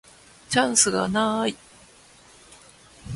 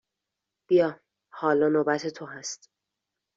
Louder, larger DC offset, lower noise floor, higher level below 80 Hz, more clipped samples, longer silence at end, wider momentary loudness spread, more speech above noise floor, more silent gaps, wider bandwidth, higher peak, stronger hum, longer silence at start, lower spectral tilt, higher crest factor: first, -22 LUFS vs -26 LUFS; neither; second, -52 dBFS vs -86 dBFS; first, -54 dBFS vs -72 dBFS; neither; second, 0 s vs 0.8 s; second, 10 LU vs 14 LU; second, 30 dB vs 61 dB; neither; first, 11.5 kHz vs 7.8 kHz; first, -6 dBFS vs -10 dBFS; neither; second, 0.5 s vs 0.7 s; second, -2.5 dB/octave vs -4.5 dB/octave; about the same, 20 dB vs 18 dB